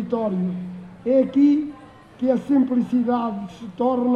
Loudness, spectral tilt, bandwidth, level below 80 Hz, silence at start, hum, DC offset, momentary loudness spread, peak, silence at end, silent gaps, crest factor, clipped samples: -21 LUFS; -9 dB/octave; 7 kHz; -60 dBFS; 0 s; none; under 0.1%; 15 LU; -8 dBFS; 0 s; none; 14 dB; under 0.1%